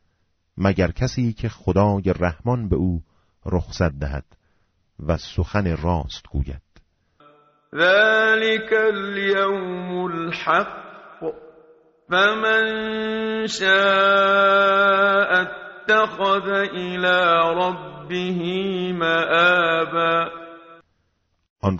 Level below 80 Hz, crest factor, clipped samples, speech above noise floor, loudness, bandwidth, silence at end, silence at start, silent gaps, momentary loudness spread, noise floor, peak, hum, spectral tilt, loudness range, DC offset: -40 dBFS; 18 dB; under 0.1%; 49 dB; -20 LUFS; 7.6 kHz; 0 s; 0.55 s; 21.50-21.56 s; 14 LU; -69 dBFS; -4 dBFS; none; -3 dB/octave; 9 LU; under 0.1%